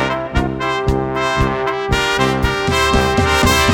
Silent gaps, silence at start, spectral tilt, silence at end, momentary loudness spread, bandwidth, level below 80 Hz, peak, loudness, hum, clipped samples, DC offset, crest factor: none; 0 s; -4.5 dB/octave; 0 s; 6 LU; over 20 kHz; -26 dBFS; 0 dBFS; -16 LUFS; none; under 0.1%; under 0.1%; 14 dB